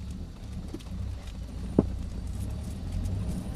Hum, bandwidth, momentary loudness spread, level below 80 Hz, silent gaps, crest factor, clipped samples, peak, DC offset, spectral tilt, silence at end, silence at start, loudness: none; 14 kHz; 12 LU; -38 dBFS; none; 28 dB; under 0.1%; -6 dBFS; under 0.1%; -7.5 dB/octave; 0 s; 0 s; -35 LUFS